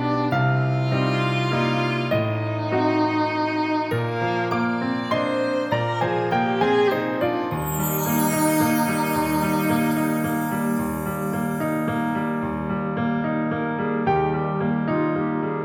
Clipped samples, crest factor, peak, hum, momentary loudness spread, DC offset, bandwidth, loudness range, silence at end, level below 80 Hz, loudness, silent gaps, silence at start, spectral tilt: under 0.1%; 14 dB; -8 dBFS; none; 5 LU; under 0.1%; over 20 kHz; 3 LU; 0 s; -50 dBFS; -23 LUFS; none; 0 s; -6 dB/octave